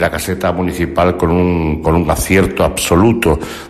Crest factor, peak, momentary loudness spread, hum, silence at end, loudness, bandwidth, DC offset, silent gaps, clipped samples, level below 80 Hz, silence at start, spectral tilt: 12 dB; -2 dBFS; 5 LU; none; 0 s; -14 LUFS; 15 kHz; under 0.1%; none; under 0.1%; -28 dBFS; 0 s; -5.5 dB/octave